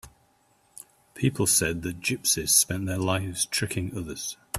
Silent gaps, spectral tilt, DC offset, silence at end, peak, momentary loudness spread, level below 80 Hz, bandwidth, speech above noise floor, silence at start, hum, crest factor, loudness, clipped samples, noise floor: none; -3 dB/octave; under 0.1%; 0 s; -6 dBFS; 13 LU; -54 dBFS; 15.5 kHz; 38 dB; 0.05 s; none; 22 dB; -25 LUFS; under 0.1%; -65 dBFS